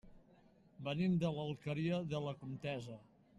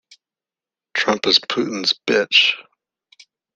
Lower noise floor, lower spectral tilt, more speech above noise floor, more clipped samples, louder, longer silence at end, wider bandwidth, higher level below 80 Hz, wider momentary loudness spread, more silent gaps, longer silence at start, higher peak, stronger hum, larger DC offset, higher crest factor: second, -67 dBFS vs under -90 dBFS; first, -7.5 dB/octave vs -2 dB/octave; second, 28 dB vs over 72 dB; neither; second, -40 LUFS vs -17 LUFS; second, 0.35 s vs 0.95 s; second, 8.4 kHz vs 13 kHz; about the same, -70 dBFS vs -66 dBFS; first, 12 LU vs 9 LU; neither; second, 0.05 s vs 0.95 s; second, -26 dBFS vs 0 dBFS; neither; neither; about the same, 16 dB vs 20 dB